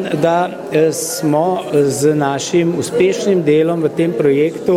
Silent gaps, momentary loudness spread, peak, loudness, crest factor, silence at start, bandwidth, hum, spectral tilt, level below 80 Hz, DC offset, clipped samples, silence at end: none; 3 LU; -2 dBFS; -15 LUFS; 14 dB; 0 s; 16 kHz; none; -5.5 dB/octave; -58 dBFS; under 0.1%; under 0.1%; 0 s